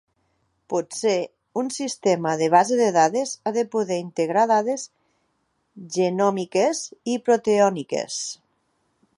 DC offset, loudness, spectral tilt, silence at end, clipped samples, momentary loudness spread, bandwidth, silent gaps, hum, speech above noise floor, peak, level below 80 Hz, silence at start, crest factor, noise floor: under 0.1%; -22 LUFS; -4.5 dB/octave; 0.85 s; under 0.1%; 11 LU; 11.5 kHz; none; none; 49 dB; -4 dBFS; -74 dBFS; 0.7 s; 20 dB; -71 dBFS